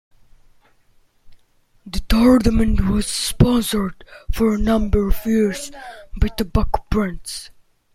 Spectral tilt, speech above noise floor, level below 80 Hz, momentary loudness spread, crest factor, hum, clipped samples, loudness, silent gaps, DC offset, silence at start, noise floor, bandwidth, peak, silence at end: -5.5 dB/octave; 39 dB; -26 dBFS; 16 LU; 16 dB; none; under 0.1%; -19 LUFS; none; under 0.1%; 1.25 s; -57 dBFS; 16 kHz; -2 dBFS; 0.45 s